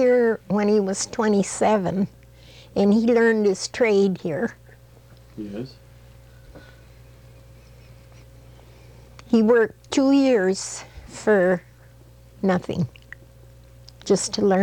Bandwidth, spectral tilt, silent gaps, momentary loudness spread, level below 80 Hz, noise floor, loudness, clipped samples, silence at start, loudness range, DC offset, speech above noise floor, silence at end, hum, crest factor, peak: 18 kHz; -5.5 dB/octave; none; 15 LU; -52 dBFS; -48 dBFS; -21 LUFS; under 0.1%; 0 s; 17 LU; under 0.1%; 28 dB; 0 s; none; 16 dB; -8 dBFS